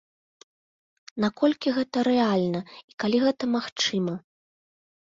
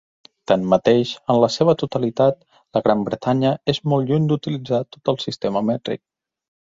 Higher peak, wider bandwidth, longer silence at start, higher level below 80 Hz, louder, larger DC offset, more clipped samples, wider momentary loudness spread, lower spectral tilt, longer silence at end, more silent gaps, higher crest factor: second, -10 dBFS vs -2 dBFS; about the same, 7.6 kHz vs 7.8 kHz; first, 1.15 s vs 0.5 s; second, -68 dBFS vs -58 dBFS; second, -25 LUFS vs -20 LUFS; neither; neither; about the same, 10 LU vs 8 LU; second, -5 dB/octave vs -7 dB/octave; first, 0.85 s vs 0.7 s; first, 2.84-2.88 s, 2.94-2.98 s, 3.72-3.76 s vs none; about the same, 18 dB vs 18 dB